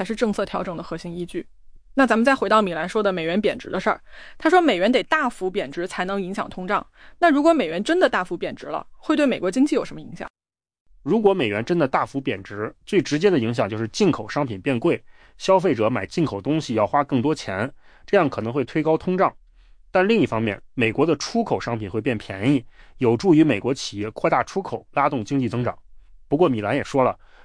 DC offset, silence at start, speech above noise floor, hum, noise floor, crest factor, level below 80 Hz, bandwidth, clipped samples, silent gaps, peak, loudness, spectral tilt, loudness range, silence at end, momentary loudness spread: under 0.1%; 0 s; 29 dB; none; -50 dBFS; 16 dB; -52 dBFS; 10.5 kHz; under 0.1%; 10.30-10.34 s, 10.80-10.86 s; -6 dBFS; -22 LUFS; -6 dB/octave; 2 LU; 0.3 s; 11 LU